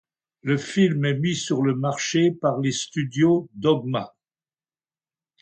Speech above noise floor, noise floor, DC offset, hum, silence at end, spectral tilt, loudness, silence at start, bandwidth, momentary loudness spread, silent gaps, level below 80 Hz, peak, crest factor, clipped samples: over 68 dB; under -90 dBFS; under 0.1%; none; 1.35 s; -5.5 dB/octave; -23 LUFS; 0.45 s; 9 kHz; 7 LU; none; -66 dBFS; -8 dBFS; 16 dB; under 0.1%